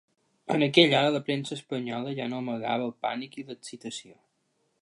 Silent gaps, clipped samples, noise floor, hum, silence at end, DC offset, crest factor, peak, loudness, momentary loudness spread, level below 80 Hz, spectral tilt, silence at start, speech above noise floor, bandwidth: none; under 0.1%; -74 dBFS; none; 0.7 s; under 0.1%; 24 dB; -6 dBFS; -27 LUFS; 20 LU; -78 dBFS; -5 dB/octave; 0.5 s; 46 dB; 11.5 kHz